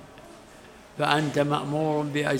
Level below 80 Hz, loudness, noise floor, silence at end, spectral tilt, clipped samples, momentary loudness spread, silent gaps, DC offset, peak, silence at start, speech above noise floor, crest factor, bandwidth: -60 dBFS; -25 LUFS; -49 dBFS; 0 s; -5.5 dB/octave; under 0.1%; 22 LU; none; under 0.1%; -4 dBFS; 0 s; 24 dB; 22 dB; 16.5 kHz